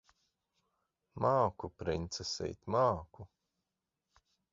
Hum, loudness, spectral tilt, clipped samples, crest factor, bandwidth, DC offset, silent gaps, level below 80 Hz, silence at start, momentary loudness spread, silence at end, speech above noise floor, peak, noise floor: none; -35 LUFS; -5 dB/octave; under 0.1%; 20 dB; 7.4 kHz; under 0.1%; none; -58 dBFS; 1.15 s; 11 LU; 1.25 s; 54 dB; -16 dBFS; -89 dBFS